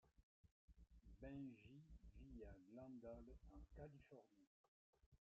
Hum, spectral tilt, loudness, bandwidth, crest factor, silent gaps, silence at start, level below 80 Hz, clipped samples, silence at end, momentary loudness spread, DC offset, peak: none; -8 dB/octave; -62 LUFS; 7 kHz; 16 dB; 0.23-0.44 s, 0.51-0.68 s, 4.47-4.93 s, 5.06-5.12 s; 0.05 s; -70 dBFS; under 0.1%; 0.25 s; 10 LU; under 0.1%; -46 dBFS